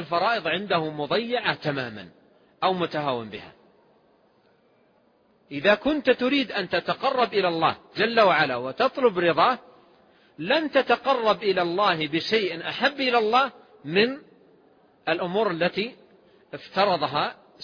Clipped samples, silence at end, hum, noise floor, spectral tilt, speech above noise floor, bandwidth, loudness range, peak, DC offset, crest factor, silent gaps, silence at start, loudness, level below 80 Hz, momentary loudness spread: under 0.1%; 0 s; none; -62 dBFS; -6 dB/octave; 39 dB; 5.2 kHz; 7 LU; -6 dBFS; under 0.1%; 20 dB; none; 0 s; -24 LUFS; -64 dBFS; 11 LU